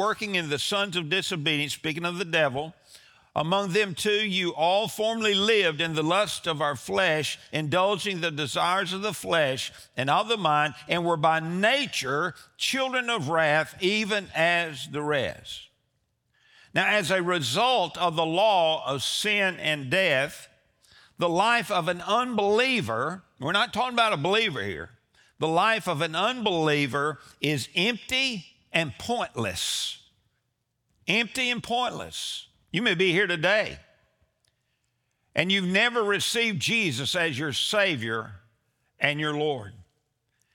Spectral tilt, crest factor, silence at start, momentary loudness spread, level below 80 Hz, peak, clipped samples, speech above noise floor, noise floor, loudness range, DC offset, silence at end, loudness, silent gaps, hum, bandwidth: -3.5 dB/octave; 22 dB; 0 s; 9 LU; -66 dBFS; -4 dBFS; under 0.1%; 51 dB; -77 dBFS; 3 LU; under 0.1%; 0.7 s; -25 LUFS; none; none; over 20 kHz